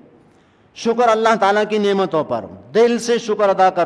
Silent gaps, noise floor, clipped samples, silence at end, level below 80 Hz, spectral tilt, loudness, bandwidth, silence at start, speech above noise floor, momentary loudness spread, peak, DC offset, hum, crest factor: none; -52 dBFS; under 0.1%; 0 s; -62 dBFS; -4.5 dB/octave; -17 LUFS; 11 kHz; 0.75 s; 36 dB; 8 LU; -2 dBFS; under 0.1%; none; 16 dB